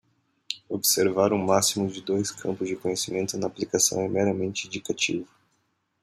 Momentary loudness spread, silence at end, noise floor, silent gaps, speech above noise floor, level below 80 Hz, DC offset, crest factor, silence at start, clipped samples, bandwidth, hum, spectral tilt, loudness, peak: 10 LU; 0.8 s; -72 dBFS; none; 47 dB; -68 dBFS; under 0.1%; 20 dB; 0.5 s; under 0.1%; 16 kHz; none; -3 dB/octave; -25 LUFS; -6 dBFS